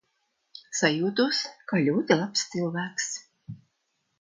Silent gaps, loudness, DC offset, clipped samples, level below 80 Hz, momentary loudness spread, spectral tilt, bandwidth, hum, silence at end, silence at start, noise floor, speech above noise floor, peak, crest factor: none; -26 LUFS; under 0.1%; under 0.1%; -72 dBFS; 21 LU; -4 dB/octave; 10 kHz; none; 0.65 s; 0.55 s; -76 dBFS; 50 dB; -6 dBFS; 22 dB